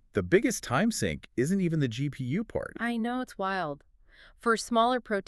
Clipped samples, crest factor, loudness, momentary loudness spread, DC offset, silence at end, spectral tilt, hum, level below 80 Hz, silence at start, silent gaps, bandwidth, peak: under 0.1%; 18 dB; -29 LUFS; 8 LU; under 0.1%; 0.05 s; -5.5 dB/octave; none; -54 dBFS; 0.15 s; none; 13.5 kHz; -10 dBFS